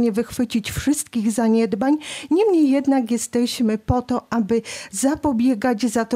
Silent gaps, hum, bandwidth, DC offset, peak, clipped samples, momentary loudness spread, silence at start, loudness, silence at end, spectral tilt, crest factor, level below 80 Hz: none; none; 16 kHz; under 0.1%; -8 dBFS; under 0.1%; 6 LU; 0 s; -20 LUFS; 0 s; -5 dB/octave; 12 dB; -44 dBFS